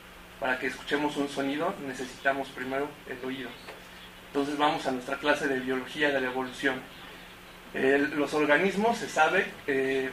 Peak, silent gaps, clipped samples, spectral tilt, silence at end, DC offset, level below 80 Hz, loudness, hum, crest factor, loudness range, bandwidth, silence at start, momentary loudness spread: -10 dBFS; none; under 0.1%; -4.5 dB/octave; 0 s; under 0.1%; -60 dBFS; -29 LUFS; none; 20 dB; 5 LU; 15.5 kHz; 0 s; 20 LU